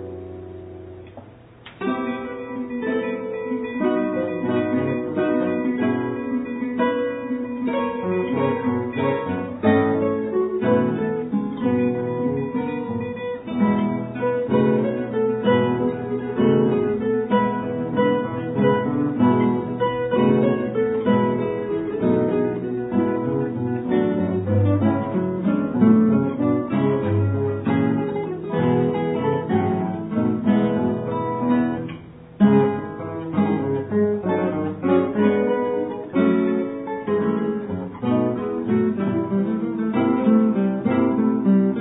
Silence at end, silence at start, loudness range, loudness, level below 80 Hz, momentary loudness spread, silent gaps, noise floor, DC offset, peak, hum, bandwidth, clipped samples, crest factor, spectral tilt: 0 s; 0 s; 3 LU; -22 LUFS; -56 dBFS; 8 LU; none; -44 dBFS; under 0.1%; -4 dBFS; none; 4 kHz; under 0.1%; 16 dB; -12 dB/octave